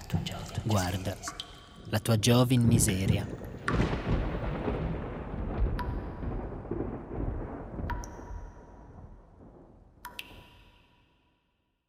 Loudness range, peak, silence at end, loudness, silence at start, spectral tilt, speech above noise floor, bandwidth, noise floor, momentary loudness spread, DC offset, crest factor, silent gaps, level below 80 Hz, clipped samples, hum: 18 LU; -10 dBFS; 1.4 s; -31 LUFS; 0 s; -5.5 dB/octave; 49 dB; 16.5 kHz; -76 dBFS; 21 LU; under 0.1%; 22 dB; none; -40 dBFS; under 0.1%; none